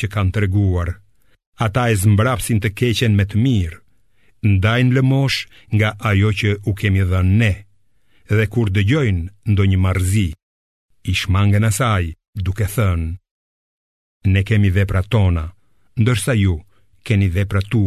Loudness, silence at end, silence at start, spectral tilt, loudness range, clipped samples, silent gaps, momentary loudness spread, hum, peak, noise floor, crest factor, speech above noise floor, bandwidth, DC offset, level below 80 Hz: -18 LUFS; 0 s; 0 s; -6 dB/octave; 3 LU; under 0.1%; 1.47-1.53 s, 10.43-10.89 s, 12.28-12.33 s, 13.31-14.20 s; 9 LU; none; -2 dBFS; -62 dBFS; 14 dB; 46 dB; 14 kHz; 0.3%; -30 dBFS